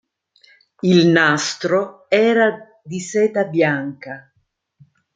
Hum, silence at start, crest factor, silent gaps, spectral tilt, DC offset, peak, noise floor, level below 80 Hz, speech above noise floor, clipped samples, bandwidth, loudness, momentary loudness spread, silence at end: none; 0.85 s; 18 dB; none; -5 dB/octave; under 0.1%; -2 dBFS; -67 dBFS; -66 dBFS; 50 dB; under 0.1%; 9.4 kHz; -17 LUFS; 19 LU; 0.95 s